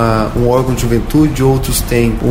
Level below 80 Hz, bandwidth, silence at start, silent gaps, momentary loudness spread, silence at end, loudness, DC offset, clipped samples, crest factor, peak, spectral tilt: -22 dBFS; 16.5 kHz; 0 s; none; 3 LU; 0 s; -13 LUFS; under 0.1%; under 0.1%; 12 dB; 0 dBFS; -6 dB/octave